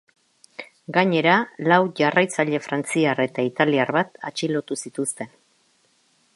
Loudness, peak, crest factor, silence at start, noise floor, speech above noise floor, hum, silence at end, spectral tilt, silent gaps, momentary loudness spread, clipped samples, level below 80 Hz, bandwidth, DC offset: -21 LUFS; -2 dBFS; 22 dB; 0.6 s; -63 dBFS; 42 dB; none; 1.1 s; -4.5 dB/octave; none; 16 LU; under 0.1%; -72 dBFS; 11.5 kHz; under 0.1%